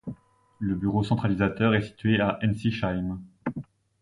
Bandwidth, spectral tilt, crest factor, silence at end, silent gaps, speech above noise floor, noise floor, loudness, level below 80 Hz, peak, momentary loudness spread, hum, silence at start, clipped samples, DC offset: 11 kHz; -8 dB/octave; 18 dB; 0.4 s; none; 25 dB; -50 dBFS; -27 LUFS; -48 dBFS; -8 dBFS; 11 LU; none; 0.05 s; under 0.1%; under 0.1%